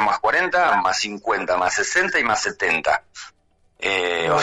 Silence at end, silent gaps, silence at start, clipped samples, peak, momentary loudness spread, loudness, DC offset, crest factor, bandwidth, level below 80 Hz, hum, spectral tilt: 0 s; none; 0 s; under 0.1%; -8 dBFS; 6 LU; -20 LUFS; under 0.1%; 12 dB; 11.5 kHz; -54 dBFS; none; -2 dB/octave